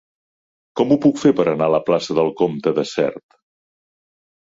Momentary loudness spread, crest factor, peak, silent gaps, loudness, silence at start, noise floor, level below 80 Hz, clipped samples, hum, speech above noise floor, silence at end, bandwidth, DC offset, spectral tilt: 7 LU; 18 dB; -2 dBFS; none; -18 LUFS; 0.75 s; under -90 dBFS; -60 dBFS; under 0.1%; none; over 73 dB; 1.25 s; 7.8 kHz; under 0.1%; -6.5 dB/octave